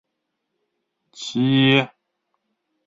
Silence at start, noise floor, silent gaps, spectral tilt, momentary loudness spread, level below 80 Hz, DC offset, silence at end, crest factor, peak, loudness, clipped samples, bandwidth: 1.15 s; -78 dBFS; none; -6 dB/octave; 17 LU; -66 dBFS; under 0.1%; 1 s; 20 dB; -4 dBFS; -18 LUFS; under 0.1%; 7.8 kHz